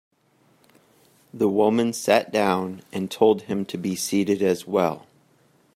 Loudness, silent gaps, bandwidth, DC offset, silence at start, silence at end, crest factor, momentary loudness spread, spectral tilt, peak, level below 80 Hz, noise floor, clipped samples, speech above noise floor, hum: -23 LUFS; none; 16 kHz; under 0.1%; 1.35 s; 0.8 s; 20 dB; 9 LU; -5 dB/octave; -4 dBFS; -68 dBFS; -62 dBFS; under 0.1%; 40 dB; none